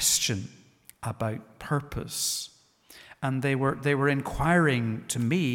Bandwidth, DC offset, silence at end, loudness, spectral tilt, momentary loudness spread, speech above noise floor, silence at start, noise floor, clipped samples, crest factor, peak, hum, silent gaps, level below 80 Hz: 18 kHz; under 0.1%; 0 s; -27 LUFS; -4 dB/octave; 13 LU; 29 dB; 0 s; -56 dBFS; under 0.1%; 18 dB; -10 dBFS; none; none; -50 dBFS